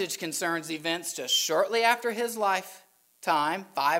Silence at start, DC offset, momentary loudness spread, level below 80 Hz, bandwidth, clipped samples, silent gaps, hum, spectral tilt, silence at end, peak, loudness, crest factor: 0 s; under 0.1%; 7 LU; -86 dBFS; 16 kHz; under 0.1%; none; none; -1.5 dB/octave; 0 s; -8 dBFS; -27 LUFS; 20 dB